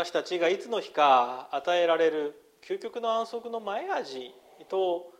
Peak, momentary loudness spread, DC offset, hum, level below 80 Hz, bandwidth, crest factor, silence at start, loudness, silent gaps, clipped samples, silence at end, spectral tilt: -8 dBFS; 14 LU; under 0.1%; none; -82 dBFS; 13 kHz; 20 dB; 0 s; -28 LUFS; none; under 0.1%; 0.1 s; -3.5 dB/octave